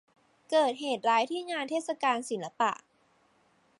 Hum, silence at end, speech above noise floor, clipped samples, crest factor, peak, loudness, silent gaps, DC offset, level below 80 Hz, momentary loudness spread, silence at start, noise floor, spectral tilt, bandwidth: none; 1.05 s; 39 dB; under 0.1%; 18 dB; -14 dBFS; -30 LUFS; none; under 0.1%; -86 dBFS; 6 LU; 0.5 s; -68 dBFS; -3 dB/octave; 11.5 kHz